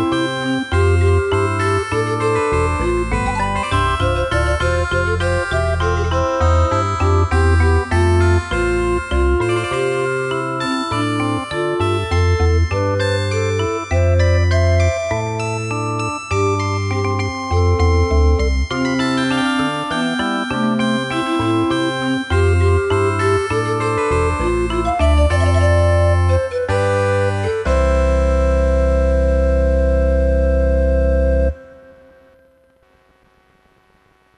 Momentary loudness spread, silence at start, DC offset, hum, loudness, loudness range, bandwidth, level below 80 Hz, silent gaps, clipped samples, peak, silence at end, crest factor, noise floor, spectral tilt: 5 LU; 0 s; under 0.1%; none; -17 LUFS; 3 LU; 11 kHz; -22 dBFS; none; under 0.1%; -4 dBFS; 2.65 s; 14 dB; -55 dBFS; -6.5 dB/octave